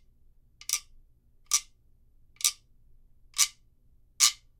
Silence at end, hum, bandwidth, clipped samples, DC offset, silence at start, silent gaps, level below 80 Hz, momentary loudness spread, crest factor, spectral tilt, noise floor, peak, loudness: 0.25 s; none; 17.5 kHz; under 0.1%; under 0.1%; 0.7 s; none; -60 dBFS; 12 LU; 32 dB; 5 dB/octave; -61 dBFS; -2 dBFS; -27 LUFS